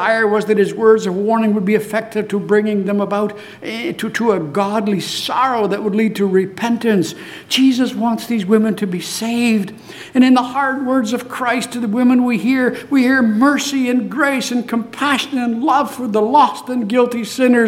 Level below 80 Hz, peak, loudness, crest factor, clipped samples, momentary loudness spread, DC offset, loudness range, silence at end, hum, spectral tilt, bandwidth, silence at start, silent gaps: -62 dBFS; -2 dBFS; -16 LUFS; 14 dB; under 0.1%; 8 LU; under 0.1%; 3 LU; 0 s; none; -5 dB/octave; 16 kHz; 0 s; none